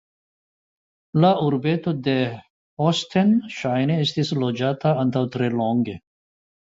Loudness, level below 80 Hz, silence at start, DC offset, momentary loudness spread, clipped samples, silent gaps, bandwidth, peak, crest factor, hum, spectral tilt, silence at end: -22 LUFS; -60 dBFS; 1.15 s; under 0.1%; 6 LU; under 0.1%; 2.50-2.77 s; 7.8 kHz; -4 dBFS; 18 dB; none; -7 dB/octave; 0.7 s